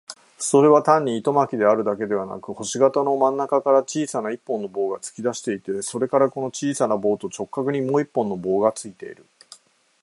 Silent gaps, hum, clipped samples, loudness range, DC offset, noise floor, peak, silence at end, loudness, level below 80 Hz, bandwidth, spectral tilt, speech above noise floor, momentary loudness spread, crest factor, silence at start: none; none; under 0.1%; 5 LU; under 0.1%; -51 dBFS; -2 dBFS; 0.9 s; -21 LUFS; -68 dBFS; 11.5 kHz; -5 dB/octave; 29 dB; 11 LU; 20 dB; 0.1 s